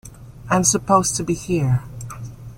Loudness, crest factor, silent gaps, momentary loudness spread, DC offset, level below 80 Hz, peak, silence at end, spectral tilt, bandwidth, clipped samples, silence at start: -19 LUFS; 18 dB; none; 17 LU; under 0.1%; -44 dBFS; -2 dBFS; 0 s; -4.5 dB/octave; 16.5 kHz; under 0.1%; 0.05 s